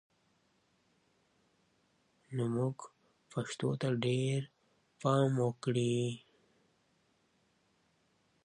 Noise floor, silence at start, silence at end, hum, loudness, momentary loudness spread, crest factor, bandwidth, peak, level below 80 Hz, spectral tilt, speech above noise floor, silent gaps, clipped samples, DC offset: -74 dBFS; 2.3 s; 2.25 s; none; -35 LUFS; 14 LU; 20 dB; 10.5 kHz; -18 dBFS; -78 dBFS; -6.5 dB/octave; 41 dB; none; under 0.1%; under 0.1%